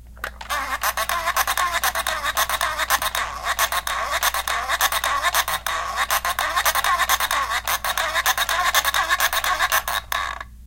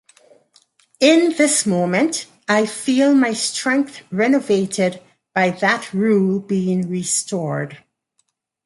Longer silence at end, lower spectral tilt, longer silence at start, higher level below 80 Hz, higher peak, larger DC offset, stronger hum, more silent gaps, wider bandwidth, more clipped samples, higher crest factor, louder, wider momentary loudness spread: second, 0 s vs 0.9 s; second, 0.5 dB/octave vs -4 dB/octave; second, 0 s vs 1 s; first, -42 dBFS vs -64 dBFS; about the same, -4 dBFS vs -2 dBFS; neither; neither; neither; first, 17.5 kHz vs 11.5 kHz; neither; about the same, 20 dB vs 18 dB; second, -21 LUFS vs -18 LUFS; second, 6 LU vs 9 LU